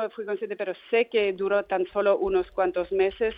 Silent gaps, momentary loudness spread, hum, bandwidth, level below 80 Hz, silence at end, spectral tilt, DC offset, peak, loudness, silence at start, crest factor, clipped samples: none; 8 LU; none; 4.9 kHz; -54 dBFS; 0 s; -7.5 dB/octave; under 0.1%; -12 dBFS; -26 LUFS; 0 s; 14 dB; under 0.1%